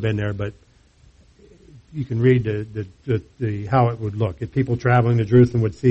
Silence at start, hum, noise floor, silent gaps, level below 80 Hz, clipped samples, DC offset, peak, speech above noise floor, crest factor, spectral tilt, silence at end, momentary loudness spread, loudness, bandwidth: 0 s; none; -53 dBFS; none; -48 dBFS; under 0.1%; under 0.1%; -4 dBFS; 34 dB; 16 dB; -9 dB/octave; 0 s; 15 LU; -20 LUFS; 6.8 kHz